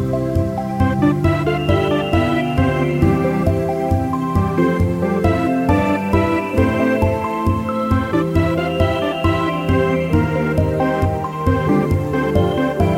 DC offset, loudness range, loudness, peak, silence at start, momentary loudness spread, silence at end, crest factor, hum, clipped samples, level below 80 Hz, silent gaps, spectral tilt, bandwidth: 0.1%; 1 LU; -18 LUFS; -2 dBFS; 0 s; 3 LU; 0 s; 14 dB; none; under 0.1%; -32 dBFS; none; -8 dB/octave; 16 kHz